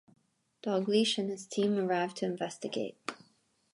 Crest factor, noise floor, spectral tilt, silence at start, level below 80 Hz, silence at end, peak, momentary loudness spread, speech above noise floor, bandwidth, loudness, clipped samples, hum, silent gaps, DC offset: 18 dB; -70 dBFS; -4.5 dB/octave; 0.65 s; -82 dBFS; 0.6 s; -16 dBFS; 12 LU; 39 dB; 11.5 kHz; -32 LUFS; under 0.1%; none; none; under 0.1%